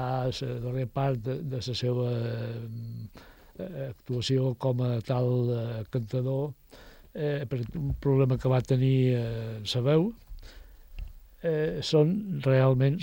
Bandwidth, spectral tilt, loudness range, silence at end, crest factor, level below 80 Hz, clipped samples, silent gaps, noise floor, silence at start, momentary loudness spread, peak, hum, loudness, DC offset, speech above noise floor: 16.5 kHz; -7.5 dB/octave; 5 LU; 0 s; 16 dB; -50 dBFS; under 0.1%; none; -48 dBFS; 0 s; 15 LU; -12 dBFS; none; -28 LUFS; under 0.1%; 20 dB